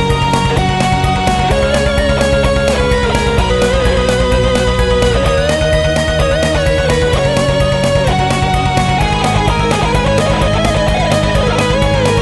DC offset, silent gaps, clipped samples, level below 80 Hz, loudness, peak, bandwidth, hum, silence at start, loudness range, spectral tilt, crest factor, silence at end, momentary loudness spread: under 0.1%; none; under 0.1%; -20 dBFS; -12 LUFS; 0 dBFS; 12 kHz; none; 0 s; 0 LU; -5 dB/octave; 12 dB; 0 s; 1 LU